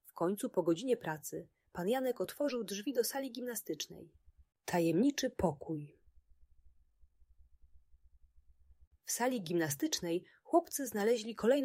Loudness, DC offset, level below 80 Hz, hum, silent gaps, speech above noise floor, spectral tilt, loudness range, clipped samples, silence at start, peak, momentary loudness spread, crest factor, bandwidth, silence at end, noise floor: -36 LUFS; under 0.1%; -66 dBFS; none; 8.87-8.91 s; 31 dB; -4.5 dB/octave; 7 LU; under 0.1%; 0.15 s; -16 dBFS; 12 LU; 20 dB; 16 kHz; 0 s; -66 dBFS